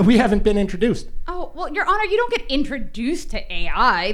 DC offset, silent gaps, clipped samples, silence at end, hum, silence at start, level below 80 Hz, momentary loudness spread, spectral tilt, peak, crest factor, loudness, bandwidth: under 0.1%; none; under 0.1%; 0 s; none; 0 s; -28 dBFS; 12 LU; -5.5 dB/octave; -2 dBFS; 16 dB; -21 LUFS; 11.5 kHz